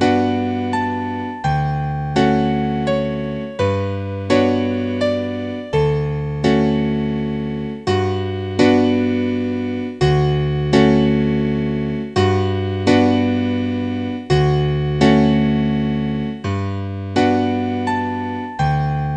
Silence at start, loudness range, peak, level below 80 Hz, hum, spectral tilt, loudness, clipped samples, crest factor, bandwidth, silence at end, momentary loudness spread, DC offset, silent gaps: 0 s; 3 LU; 0 dBFS; -38 dBFS; none; -7.5 dB/octave; -18 LUFS; under 0.1%; 18 dB; 9.2 kHz; 0 s; 9 LU; under 0.1%; none